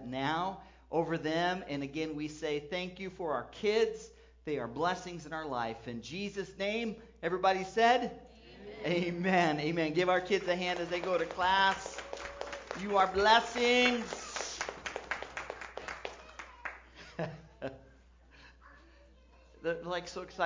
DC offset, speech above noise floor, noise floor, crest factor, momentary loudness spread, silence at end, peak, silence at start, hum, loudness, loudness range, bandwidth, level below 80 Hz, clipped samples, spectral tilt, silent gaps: under 0.1%; 28 dB; -60 dBFS; 22 dB; 17 LU; 0 s; -12 dBFS; 0 s; none; -33 LUFS; 14 LU; 7.6 kHz; -60 dBFS; under 0.1%; -4 dB/octave; none